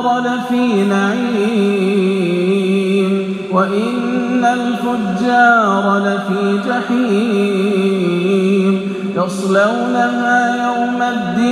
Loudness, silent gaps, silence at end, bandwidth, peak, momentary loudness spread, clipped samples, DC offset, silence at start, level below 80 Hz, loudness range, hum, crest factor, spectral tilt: -15 LUFS; none; 0 s; 12.5 kHz; 0 dBFS; 4 LU; under 0.1%; under 0.1%; 0 s; -58 dBFS; 1 LU; none; 14 dB; -6.5 dB/octave